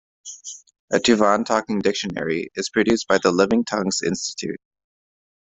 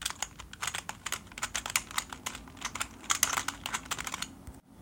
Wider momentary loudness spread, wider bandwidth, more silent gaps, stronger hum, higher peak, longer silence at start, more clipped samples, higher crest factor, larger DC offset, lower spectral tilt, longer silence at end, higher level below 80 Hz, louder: first, 18 LU vs 11 LU; second, 8.4 kHz vs 17 kHz; first, 0.79-0.88 s vs none; neither; about the same, -2 dBFS vs -2 dBFS; first, 0.25 s vs 0 s; neither; second, 20 dB vs 34 dB; neither; first, -4 dB/octave vs 0 dB/octave; first, 0.85 s vs 0 s; about the same, -56 dBFS vs -56 dBFS; first, -21 LUFS vs -34 LUFS